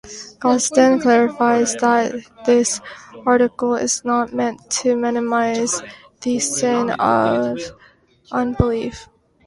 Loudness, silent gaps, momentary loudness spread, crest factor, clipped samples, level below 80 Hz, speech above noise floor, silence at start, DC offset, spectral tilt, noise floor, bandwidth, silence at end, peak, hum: -18 LUFS; none; 11 LU; 18 dB; under 0.1%; -42 dBFS; 34 dB; 0.05 s; under 0.1%; -4 dB/octave; -52 dBFS; 11.5 kHz; 0.4 s; 0 dBFS; none